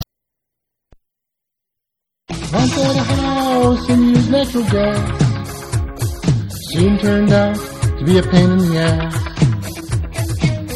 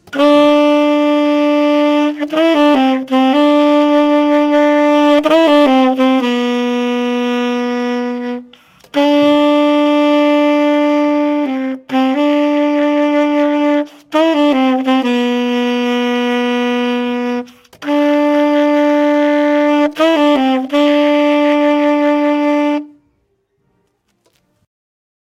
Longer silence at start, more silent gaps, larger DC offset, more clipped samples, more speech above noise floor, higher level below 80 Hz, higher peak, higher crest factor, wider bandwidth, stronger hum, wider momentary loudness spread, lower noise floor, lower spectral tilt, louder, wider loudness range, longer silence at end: about the same, 0 s vs 0.1 s; neither; neither; neither; first, 67 dB vs 52 dB; first, -30 dBFS vs -62 dBFS; about the same, 0 dBFS vs 0 dBFS; about the same, 16 dB vs 12 dB; first, 14 kHz vs 10 kHz; neither; first, 10 LU vs 7 LU; first, -81 dBFS vs -63 dBFS; first, -6.5 dB/octave vs -4 dB/octave; second, -16 LUFS vs -13 LUFS; about the same, 4 LU vs 5 LU; second, 0 s vs 2.4 s